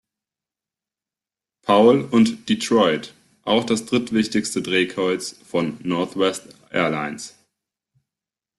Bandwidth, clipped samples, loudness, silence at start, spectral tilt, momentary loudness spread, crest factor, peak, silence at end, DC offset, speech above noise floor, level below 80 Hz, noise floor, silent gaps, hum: 12.5 kHz; under 0.1%; -20 LUFS; 1.65 s; -4.5 dB/octave; 14 LU; 18 dB; -4 dBFS; 1.3 s; under 0.1%; 70 dB; -62 dBFS; -90 dBFS; none; none